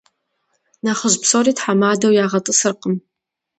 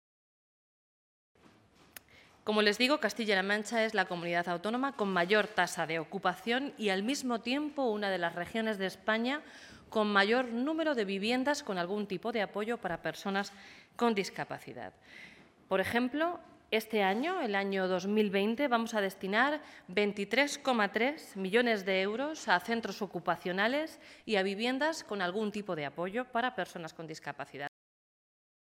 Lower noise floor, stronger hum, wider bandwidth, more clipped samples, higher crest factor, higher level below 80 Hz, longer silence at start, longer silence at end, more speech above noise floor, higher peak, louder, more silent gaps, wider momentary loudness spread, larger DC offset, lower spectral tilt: first, -69 dBFS vs -62 dBFS; neither; second, 9 kHz vs 16.5 kHz; neither; about the same, 18 dB vs 22 dB; first, -66 dBFS vs -76 dBFS; second, 0.85 s vs 2.45 s; second, 0.6 s vs 0.95 s; first, 53 dB vs 30 dB; first, 0 dBFS vs -12 dBFS; first, -16 LUFS vs -32 LUFS; neither; second, 10 LU vs 13 LU; neither; about the same, -3.5 dB/octave vs -4.5 dB/octave